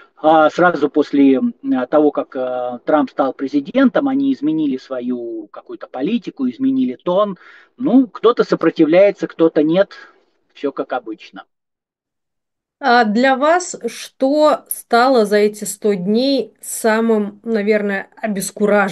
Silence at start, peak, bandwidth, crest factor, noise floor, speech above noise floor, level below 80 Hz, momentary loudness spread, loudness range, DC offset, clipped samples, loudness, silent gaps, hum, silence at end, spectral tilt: 0.25 s; 0 dBFS; 12.5 kHz; 16 dB; -82 dBFS; 66 dB; -72 dBFS; 11 LU; 5 LU; under 0.1%; under 0.1%; -16 LUFS; none; none; 0 s; -5 dB/octave